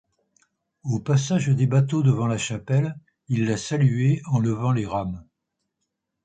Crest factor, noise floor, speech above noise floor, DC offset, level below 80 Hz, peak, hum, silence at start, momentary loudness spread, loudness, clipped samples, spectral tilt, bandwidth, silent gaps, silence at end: 16 dB; -80 dBFS; 58 dB; under 0.1%; -54 dBFS; -8 dBFS; none; 0.85 s; 9 LU; -23 LUFS; under 0.1%; -6.5 dB/octave; 9 kHz; none; 1.05 s